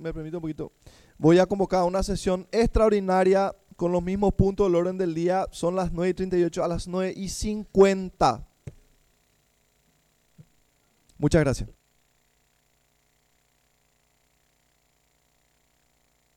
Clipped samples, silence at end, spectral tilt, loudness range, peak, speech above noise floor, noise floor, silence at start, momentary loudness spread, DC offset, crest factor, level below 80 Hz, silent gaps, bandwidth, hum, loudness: under 0.1%; 4.65 s; -6.5 dB/octave; 8 LU; -6 dBFS; 44 dB; -68 dBFS; 0 s; 13 LU; under 0.1%; 20 dB; -40 dBFS; none; 13.5 kHz; 60 Hz at -50 dBFS; -24 LUFS